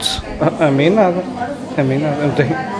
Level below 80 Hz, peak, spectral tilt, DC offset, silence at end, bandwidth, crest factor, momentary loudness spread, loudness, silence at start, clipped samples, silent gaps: -40 dBFS; 0 dBFS; -6 dB/octave; under 0.1%; 0 s; 11 kHz; 16 dB; 9 LU; -16 LUFS; 0 s; under 0.1%; none